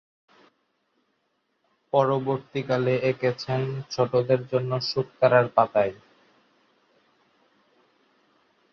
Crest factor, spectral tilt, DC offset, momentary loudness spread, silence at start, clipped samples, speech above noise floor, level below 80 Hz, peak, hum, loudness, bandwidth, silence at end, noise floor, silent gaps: 22 dB; -7 dB/octave; under 0.1%; 8 LU; 1.95 s; under 0.1%; 50 dB; -66 dBFS; -4 dBFS; none; -24 LUFS; 6.8 kHz; 2.8 s; -73 dBFS; none